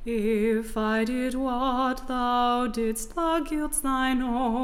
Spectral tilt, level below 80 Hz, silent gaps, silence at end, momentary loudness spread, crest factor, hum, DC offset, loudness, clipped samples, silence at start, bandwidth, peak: -4 dB/octave; -40 dBFS; none; 0 s; 4 LU; 14 dB; none; under 0.1%; -26 LUFS; under 0.1%; 0 s; 16.5 kHz; -12 dBFS